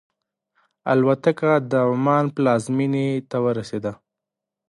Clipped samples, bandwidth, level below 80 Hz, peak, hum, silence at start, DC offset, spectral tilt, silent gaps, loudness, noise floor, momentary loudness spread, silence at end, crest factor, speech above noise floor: under 0.1%; 11.5 kHz; -64 dBFS; -4 dBFS; none; 0.85 s; under 0.1%; -7.5 dB/octave; none; -21 LUFS; -85 dBFS; 9 LU; 0.75 s; 18 dB; 65 dB